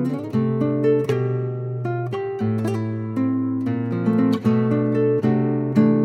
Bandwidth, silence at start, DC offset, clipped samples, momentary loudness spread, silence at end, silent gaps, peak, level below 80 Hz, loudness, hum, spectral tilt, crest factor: 9.4 kHz; 0 s; under 0.1%; under 0.1%; 7 LU; 0 s; none; -4 dBFS; -64 dBFS; -21 LUFS; none; -9.5 dB/octave; 16 dB